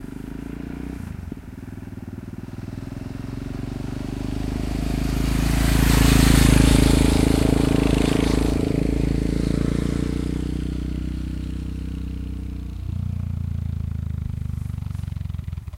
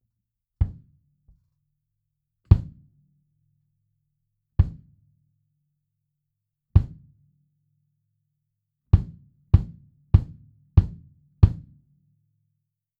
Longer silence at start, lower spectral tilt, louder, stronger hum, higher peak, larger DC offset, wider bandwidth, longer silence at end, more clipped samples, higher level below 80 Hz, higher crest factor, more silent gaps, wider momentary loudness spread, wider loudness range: second, 0 s vs 0.6 s; second, -6 dB/octave vs -11 dB/octave; about the same, -23 LUFS vs -24 LUFS; neither; about the same, -2 dBFS vs -2 dBFS; neither; first, 16 kHz vs 4.6 kHz; second, 0 s vs 1.45 s; neither; first, -26 dBFS vs -32 dBFS; second, 20 dB vs 26 dB; neither; about the same, 18 LU vs 18 LU; first, 15 LU vs 9 LU